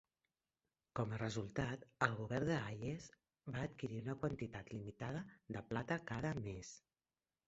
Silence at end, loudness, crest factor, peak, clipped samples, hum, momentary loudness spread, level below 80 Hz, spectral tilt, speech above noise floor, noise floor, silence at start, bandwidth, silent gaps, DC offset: 0.7 s; -44 LUFS; 28 dB; -18 dBFS; under 0.1%; none; 11 LU; -66 dBFS; -5.5 dB/octave; over 47 dB; under -90 dBFS; 0.95 s; 8 kHz; none; under 0.1%